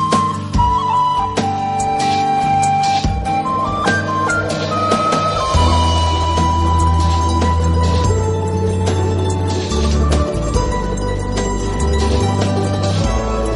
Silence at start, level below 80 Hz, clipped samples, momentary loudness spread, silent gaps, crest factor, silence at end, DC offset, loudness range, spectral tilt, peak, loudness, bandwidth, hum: 0 s; -22 dBFS; under 0.1%; 4 LU; none; 14 dB; 0 s; under 0.1%; 3 LU; -5.5 dB/octave; -2 dBFS; -16 LUFS; 11.5 kHz; none